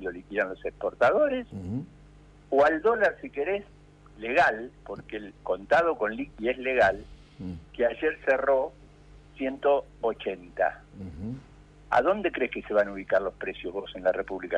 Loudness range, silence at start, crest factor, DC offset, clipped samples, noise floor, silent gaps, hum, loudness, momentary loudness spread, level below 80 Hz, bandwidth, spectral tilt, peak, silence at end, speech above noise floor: 3 LU; 0 s; 16 dB; under 0.1%; under 0.1%; -52 dBFS; none; 50 Hz at -55 dBFS; -27 LUFS; 15 LU; -54 dBFS; 9.4 kHz; -6 dB/octave; -12 dBFS; 0 s; 25 dB